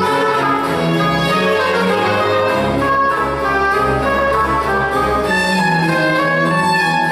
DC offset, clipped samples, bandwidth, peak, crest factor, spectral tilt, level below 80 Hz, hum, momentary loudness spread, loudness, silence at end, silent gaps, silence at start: under 0.1%; under 0.1%; 15 kHz; -4 dBFS; 10 dB; -5.5 dB/octave; -36 dBFS; none; 2 LU; -15 LUFS; 0 s; none; 0 s